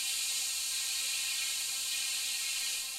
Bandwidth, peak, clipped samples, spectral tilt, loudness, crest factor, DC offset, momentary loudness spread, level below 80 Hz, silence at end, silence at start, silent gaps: 16 kHz; -22 dBFS; under 0.1%; 4.5 dB/octave; -31 LUFS; 14 dB; under 0.1%; 1 LU; -72 dBFS; 0 s; 0 s; none